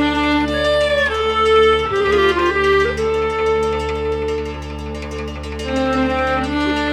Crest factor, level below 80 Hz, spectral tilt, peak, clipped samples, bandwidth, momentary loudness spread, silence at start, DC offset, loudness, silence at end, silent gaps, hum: 14 dB; -32 dBFS; -5.5 dB/octave; -4 dBFS; under 0.1%; 13 kHz; 12 LU; 0 s; under 0.1%; -17 LUFS; 0 s; none; none